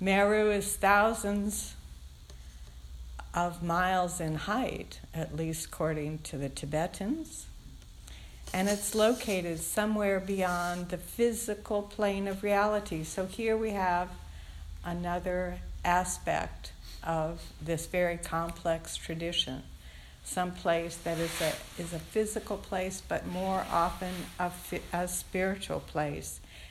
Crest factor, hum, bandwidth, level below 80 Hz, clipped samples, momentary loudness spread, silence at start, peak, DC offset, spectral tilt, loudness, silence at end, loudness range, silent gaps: 22 dB; none; 16.5 kHz; -48 dBFS; under 0.1%; 18 LU; 0 s; -10 dBFS; under 0.1%; -4 dB/octave; -32 LUFS; 0 s; 3 LU; none